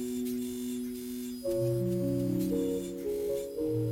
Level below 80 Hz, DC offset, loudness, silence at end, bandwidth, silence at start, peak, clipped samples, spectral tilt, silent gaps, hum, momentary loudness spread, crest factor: -56 dBFS; under 0.1%; -33 LUFS; 0 s; 17 kHz; 0 s; -20 dBFS; under 0.1%; -7 dB/octave; none; none; 6 LU; 12 dB